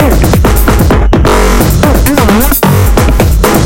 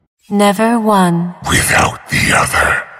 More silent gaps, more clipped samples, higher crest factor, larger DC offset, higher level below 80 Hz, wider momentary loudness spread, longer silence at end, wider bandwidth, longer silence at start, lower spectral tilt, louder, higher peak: neither; first, 0.8% vs under 0.1%; second, 6 dB vs 14 dB; neither; first, -10 dBFS vs -34 dBFS; second, 1 LU vs 4 LU; about the same, 0 s vs 0 s; about the same, 17.5 kHz vs 16 kHz; second, 0 s vs 0.3 s; first, -5.5 dB/octave vs -4 dB/octave; first, -7 LUFS vs -12 LUFS; about the same, 0 dBFS vs 0 dBFS